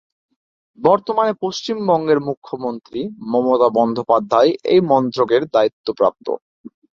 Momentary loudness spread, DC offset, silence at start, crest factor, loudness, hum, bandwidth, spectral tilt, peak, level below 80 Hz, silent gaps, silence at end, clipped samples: 12 LU; under 0.1%; 0.8 s; 16 dB; -18 LUFS; none; 7.2 kHz; -6.5 dB/octave; -2 dBFS; -62 dBFS; 2.37-2.42 s, 5.73-5.84 s, 6.42-6.64 s; 0.25 s; under 0.1%